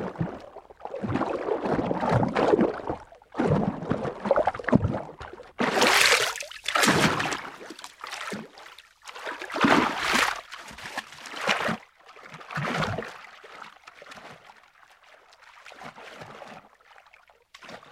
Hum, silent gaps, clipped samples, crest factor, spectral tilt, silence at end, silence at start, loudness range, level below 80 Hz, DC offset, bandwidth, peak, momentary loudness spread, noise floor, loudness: none; none; under 0.1%; 24 dB; -4 dB/octave; 0.1 s; 0 s; 23 LU; -54 dBFS; under 0.1%; 16.5 kHz; -4 dBFS; 23 LU; -58 dBFS; -25 LUFS